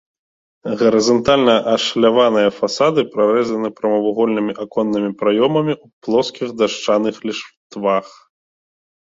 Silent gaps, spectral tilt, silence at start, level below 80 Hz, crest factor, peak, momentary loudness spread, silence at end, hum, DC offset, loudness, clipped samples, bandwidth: 5.93-6.01 s, 7.57-7.70 s; -5 dB/octave; 0.65 s; -54 dBFS; 16 dB; -2 dBFS; 10 LU; 0.95 s; none; under 0.1%; -17 LUFS; under 0.1%; 7.8 kHz